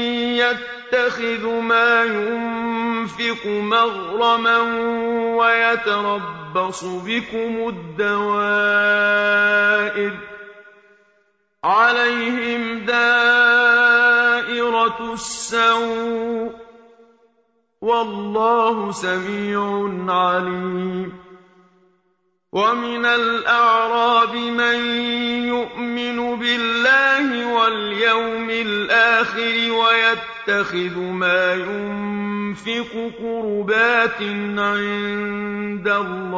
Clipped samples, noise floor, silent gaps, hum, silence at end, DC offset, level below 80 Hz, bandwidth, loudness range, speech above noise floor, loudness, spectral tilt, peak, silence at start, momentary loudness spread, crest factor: under 0.1%; -67 dBFS; none; none; 0 s; under 0.1%; -60 dBFS; 8 kHz; 7 LU; 48 dB; -18 LUFS; -4 dB/octave; -4 dBFS; 0 s; 11 LU; 16 dB